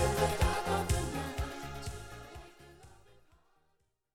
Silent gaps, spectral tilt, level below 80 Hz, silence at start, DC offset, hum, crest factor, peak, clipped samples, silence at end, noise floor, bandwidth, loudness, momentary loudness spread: none; -4.5 dB/octave; -42 dBFS; 0 s; under 0.1%; none; 20 dB; -16 dBFS; under 0.1%; 1 s; -76 dBFS; 17.5 kHz; -34 LUFS; 23 LU